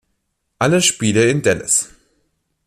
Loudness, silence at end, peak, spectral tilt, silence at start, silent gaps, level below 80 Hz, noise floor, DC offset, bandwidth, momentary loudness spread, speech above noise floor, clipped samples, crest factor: -15 LUFS; 0.8 s; -2 dBFS; -3.5 dB/octave; 0.6 s; none; -54 dBFS; -71 dBFS; under 0.1%; 14.5 kHz; 5 LU; 55 dB; under 0.1%; 16 dB